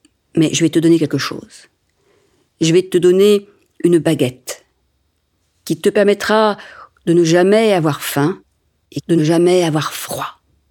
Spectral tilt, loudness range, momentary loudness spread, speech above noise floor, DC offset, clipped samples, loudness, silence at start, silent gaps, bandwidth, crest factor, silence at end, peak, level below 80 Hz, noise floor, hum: -5.5 dB/octave; 2 LU; 17 LU; 50 dB; under 0.1%; under 0.1%; -15 LUFS; 0.35 s; none; 18 kHz; 16 dB; 0.4 s; 0 dBFS; -60 dBFS; -64 dBFS; none